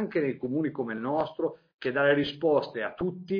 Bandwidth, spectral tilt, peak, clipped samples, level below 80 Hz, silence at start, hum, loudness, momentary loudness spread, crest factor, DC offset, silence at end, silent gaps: 5.2 kHz; -8 dB/octave; -12 dBFS; under 0.1%; -62 dBFS; 0 s; none; -29 LUFS; 9 LU; 16 dB; under 0.1%; 0 s; 1.74-1.79 s